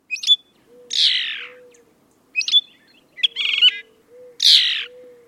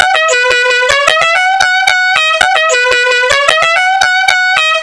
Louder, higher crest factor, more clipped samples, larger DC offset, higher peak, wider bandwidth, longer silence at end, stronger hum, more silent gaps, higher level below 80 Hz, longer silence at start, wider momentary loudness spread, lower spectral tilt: second, -16 LUFS vs -8 LUFS; first, 20 dB vs 10 dB; second, under 0.1% vs 0.7%; second, under 0.1% vs 0.3%; about the same, -2 dBFS vs 0 dBFS; first, 16.5 kHz vs 11 kHz; first, 0.4 s vs 0 s; neither; neither; second, -78 dBFS vs -46 dBFS; about the same, 0.1 s vs 0 s; first, 17 LU vs 1 LU; second, 4 dB/octave vs 1 dB/octave